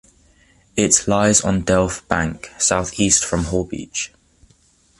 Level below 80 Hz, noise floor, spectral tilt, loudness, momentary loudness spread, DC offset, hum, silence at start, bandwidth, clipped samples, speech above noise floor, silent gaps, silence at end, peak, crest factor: -38 dBFS; -56 dBFS; -3.5 dB/octave; -18 LUFS; 11 LU; under 0.1%; none; 0.75 s; 11.5 kHz; under 0.1%; 38 dB; none; 0.95 s; 0 dBFS; 20 dB